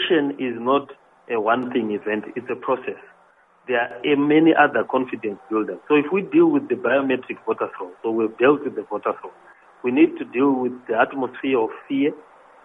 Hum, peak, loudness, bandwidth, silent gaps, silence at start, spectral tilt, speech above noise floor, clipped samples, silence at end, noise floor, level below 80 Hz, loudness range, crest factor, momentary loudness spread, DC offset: none; 0 dBFS; -21 LUFS; 3.8 kHz; none; 0 s; -8 dB/octave; 35 dB; under 0.1%; 0.45 s; -56 dBFS; -70 dBFS; 5 LU; 20 dB; 11 LU; under 0.1%